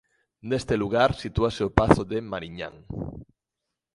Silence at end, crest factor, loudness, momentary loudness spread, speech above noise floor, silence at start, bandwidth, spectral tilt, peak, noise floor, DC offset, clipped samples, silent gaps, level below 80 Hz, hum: 0.7 s; 26 dB; -25 LUFS; 15 LU; 60 dB; 0.45 s; 11.5 kHz; -6.5 dB/octave; 0 dBFS; -85 dBFS; under 0.1%; under 0.1%; none; -40 dBFS; none